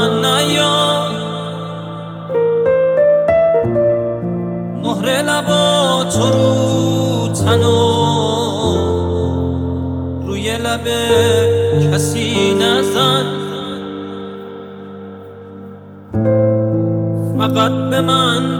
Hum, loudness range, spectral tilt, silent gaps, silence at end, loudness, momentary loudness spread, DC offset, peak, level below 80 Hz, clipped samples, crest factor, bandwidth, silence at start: none; 6 LU; -5 dB/octave; none; 0 s; -15 LUFS; 15 LU; under 0.1%; 0 dBFS; -40 dBFS; under 0.1%; 14 dB; 17 kHz; 0 s